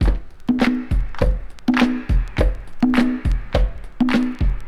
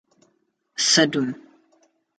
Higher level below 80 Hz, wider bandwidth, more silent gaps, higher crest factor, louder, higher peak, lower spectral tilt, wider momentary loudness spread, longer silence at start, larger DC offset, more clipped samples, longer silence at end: first, -22 dBFS vs -74 dBFS; first, 11 kHz vs 9.4 kHz; neither; about the same, 16 dB vs 20 dB; about the same, -21 LUFS vs -19 LUFS; about the same, -2 dBFS vs -4 dBFS; first, -7 dB/octave vs -2.5 dB/octave; second, 6 LU vs 20 LU; second, 0 s vs 0.8 s; neither; neither; second, 0 s vs 0.8 s